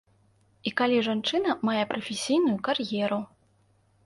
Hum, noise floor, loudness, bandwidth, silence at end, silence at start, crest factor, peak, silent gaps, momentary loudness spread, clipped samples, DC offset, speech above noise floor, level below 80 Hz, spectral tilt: none; -65 dBFS; -27 LUFS; 11.5 kHz; 0.8 s; 0.65 s; 18 dB; -10 dBFS; none; 8 LU; under 0.1%; under 0.1%; 39 dB; -70 dBFS; -4.5 dB/octave